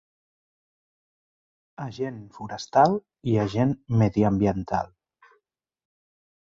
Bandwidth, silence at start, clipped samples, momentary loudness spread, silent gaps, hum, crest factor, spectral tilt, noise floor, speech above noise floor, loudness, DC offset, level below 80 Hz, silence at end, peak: 7.6 kHz; 1.8 s; under 0.1%; 17 LU; none; none; 20 dB; -8 dB/octave; -74 dBFS; 50 dB; -24 LUFS; under 0.1%; -52 dBFS; 1.6 s; -6 dBFS